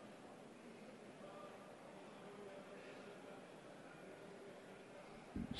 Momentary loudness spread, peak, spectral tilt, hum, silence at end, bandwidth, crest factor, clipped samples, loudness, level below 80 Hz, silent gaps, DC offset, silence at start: 3 LU; -30 dBFS; -5.5 dB/octave; none; 0 s; 11.5 kHz; 26 dB; under 0.1%; -57 LUFS; -72 dBFS; none; under 0.1%; 0 s